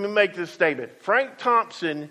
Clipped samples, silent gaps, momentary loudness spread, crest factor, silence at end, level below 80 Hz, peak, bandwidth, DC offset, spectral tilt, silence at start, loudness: under 0.1%; none; 7 LU; 20 dB; 0 s; -74 dBFS; -4 dBFS; 12.5 kHz; under 0.1%; -4.5 dB/octave; 0 s; -23 LUFS